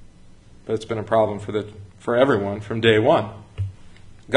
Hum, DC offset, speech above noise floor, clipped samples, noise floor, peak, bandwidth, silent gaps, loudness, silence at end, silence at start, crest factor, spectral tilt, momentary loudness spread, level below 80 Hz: none; under 0.1%; 25 dB; under 0.1%; -46 dBFS; -2 dBFS; 10.5 kHz; none; -21 LUFS; 0 s; 0 s; 22 dB; -6.5 dB/octave; 16 LU; -48 dBFS